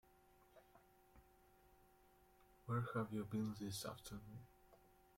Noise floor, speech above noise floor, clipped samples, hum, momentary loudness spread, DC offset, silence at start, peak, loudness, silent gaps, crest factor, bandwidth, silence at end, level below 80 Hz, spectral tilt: -72 dBFS; 25 dB; under 0.1%; none; 17 LU; under 0.1%; 0.55 s; -32 dBFS; -47 LUFS; none; 18 dB; 16.5 kHz; 0.25 s; -74 dBFS; -6 dB/octave